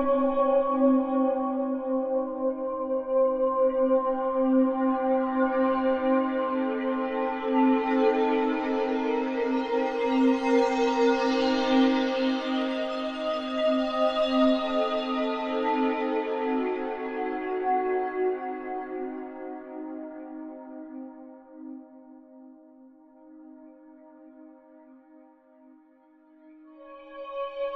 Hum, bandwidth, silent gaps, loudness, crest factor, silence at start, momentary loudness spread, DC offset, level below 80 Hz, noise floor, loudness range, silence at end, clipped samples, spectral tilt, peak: none; 7.4 kHz; none; -26 LUFS; 16 dB; 0 s; 16 LU; under 0.1%; -60 dBFS; -58 dBFS; 16 LU; 0 s; under 0.1%; -4.5 dB/octave; -12 dBFS